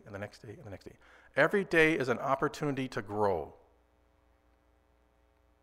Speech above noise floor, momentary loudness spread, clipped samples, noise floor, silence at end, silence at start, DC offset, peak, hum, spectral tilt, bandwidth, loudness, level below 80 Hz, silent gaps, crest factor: 37 dB; 22 LU; under 0.1%; -68 dBFS; 2.1 s; 0.05 s; under 0.1%; -12 dBFS; none; -5.5 dB/octave; 15.5 kHz; -30 LUFS; -60 dBFS; none; 22 dB